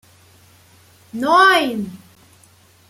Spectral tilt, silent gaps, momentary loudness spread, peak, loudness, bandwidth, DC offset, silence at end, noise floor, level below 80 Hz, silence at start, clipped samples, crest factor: -3.5 dB/octave; none; 20 LU; -2 dBFS; -15 LUFS; 16 kHz; under 0.1%; 0.95 s; -51 dBFS; -66 dBFS; 1.15 s; under 0.1%; 18 dB